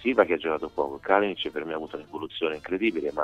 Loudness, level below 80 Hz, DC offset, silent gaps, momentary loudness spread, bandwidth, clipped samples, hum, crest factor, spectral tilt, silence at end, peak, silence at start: -27 LUFS; -60 dBFS; under 0.1%; none; 12 LU; 8.8 kHz; under 0.1%; none; 22 dB; -6 dB/octave; 0 s; -6 dBFS; 0 s